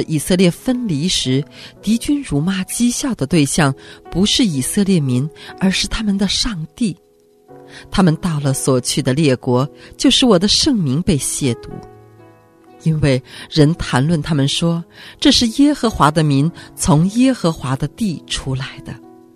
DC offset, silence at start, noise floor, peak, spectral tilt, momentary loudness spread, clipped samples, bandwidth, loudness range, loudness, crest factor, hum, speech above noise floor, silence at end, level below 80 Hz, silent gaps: under 0.1%; 0 s; -47 dBFS; 0 dBFS; -5 dB/octave; 11 LU; under 0.1%; 14 kHz; 4 LU; -16 LUFS; 16 dB; none; 31 dB; 0.4 s; -36 dBFS; none